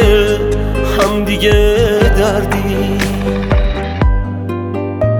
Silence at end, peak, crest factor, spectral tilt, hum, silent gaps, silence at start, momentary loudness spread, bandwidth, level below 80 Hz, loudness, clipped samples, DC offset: 0 s; 0 dBFS; 12 dB; -6 dB/octave; none; none; 0 s; 8 LU; 18.5 kHz; -18 dBFS; -14 LUFS; under 0.1%; under 0.1%